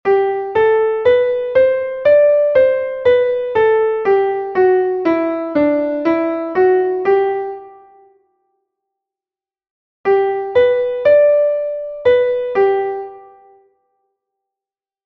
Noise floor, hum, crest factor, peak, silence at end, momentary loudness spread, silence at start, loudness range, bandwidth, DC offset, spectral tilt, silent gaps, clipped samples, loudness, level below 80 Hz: under -90 dBFS; none; 14 dB; -2 dBFS; 1.85 s; 7 LU; 0.05 s; 6 LU; 5.6 kHz; under 0.1%; -7.5 dB/octave; 9.70-10.04 s; under 0.1%; -15 LUFS; -54 dBFS